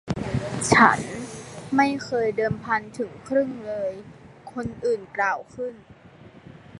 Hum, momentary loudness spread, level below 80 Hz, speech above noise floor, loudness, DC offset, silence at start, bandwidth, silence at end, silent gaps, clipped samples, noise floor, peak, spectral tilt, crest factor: none; 17 LU; -52 dBFS; 24 dB; -24 LUFS; under 0.1%; 0.05 s; 11.5 kHz; 0 s; none; under 0.1%; -48 dBFS; 0 dBFS; -5 dB/octave; 24 dB